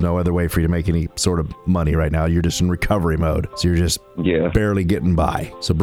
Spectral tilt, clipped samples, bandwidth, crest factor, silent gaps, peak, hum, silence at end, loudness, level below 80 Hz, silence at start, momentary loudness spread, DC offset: -6 dB/octave; under 0.1%; 16 kHz; 16 dB; none; -4 dBFS; none; 0 s; -19 LUFS; -28 dBFS; 0 s; 3 LU; under 0.1%